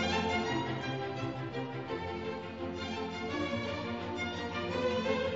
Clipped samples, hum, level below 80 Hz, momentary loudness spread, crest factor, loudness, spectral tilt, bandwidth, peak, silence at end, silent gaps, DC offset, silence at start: under 0.1%; none; -58 dBFS; 7 LU; 16 dB; -36 LUFS; -4 dB/octave; 7.6 kHz; -18 dBFS; 0 s; none; under 0.1%; 0 s